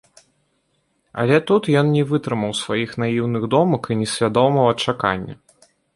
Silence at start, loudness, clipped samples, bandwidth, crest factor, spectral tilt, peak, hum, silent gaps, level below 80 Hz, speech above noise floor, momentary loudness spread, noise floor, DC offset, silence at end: 1.15 s; -19 LUFS; under 0.1%; 11.5 kHz; 18 dB; -6 dB/octave; -2 dBFS; none; none; -54 dBFS; 49 dB; 7 LU; -67 dBFS; under 0.1%; 0.6 s